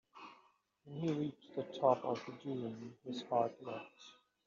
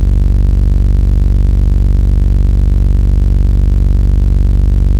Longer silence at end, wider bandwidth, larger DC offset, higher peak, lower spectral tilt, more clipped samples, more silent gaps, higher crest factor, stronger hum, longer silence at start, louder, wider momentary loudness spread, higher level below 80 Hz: first, 0.35 s vs 0 s; first, 7.4 kHz vs 3.6 kHz; neither; second, -16 dBFS vs 0 dBFS; second, -6 dB/octave vs -9 dB/octave; neither; neither; first, 24 dB vs 8 dB; neither; first, 0.15 s vs 0 s; second, -39 LUFS vs -12 LUFS; first, 22 LU vs 0 LU; second, -84 dBFS vs -10 dBFS